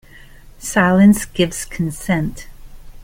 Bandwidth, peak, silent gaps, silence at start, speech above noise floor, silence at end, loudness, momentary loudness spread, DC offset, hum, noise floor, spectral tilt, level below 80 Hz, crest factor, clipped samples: 16.5 kHz; -2 dBFS; none; 0.6 s; 25 dB; 0 s; -16 LUFS; 13 LU; under 0.1%; none; -41 dBFS; -5.5 dB/octave; -38 dBFS; 16 dB; under 0.1%